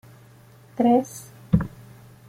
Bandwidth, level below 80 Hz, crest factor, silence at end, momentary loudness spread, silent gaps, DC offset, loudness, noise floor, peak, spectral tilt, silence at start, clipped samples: 16 kHz; -44 dBFS; 20 dB; 0.6 s; 20 LU; none; under 0.1%; -22 LUFS; -50 dBFS; -4 dBFS; -8 dB/octave; 0.8 s; under 0.1%